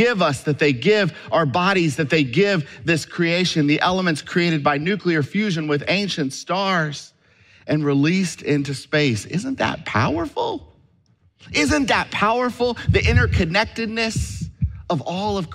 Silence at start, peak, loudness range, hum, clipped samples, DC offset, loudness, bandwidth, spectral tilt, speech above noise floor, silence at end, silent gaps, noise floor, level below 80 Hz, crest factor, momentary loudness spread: 0 s; -4 dBFS; 3 LU; none; under 0.1%; under 0.1%; -20 LUFS; 13.5 kHz; -5.5 dB/octave; 39 dB; 0 s; none; -59 dBFS; -38 dBFS; 16 dB; 7 LU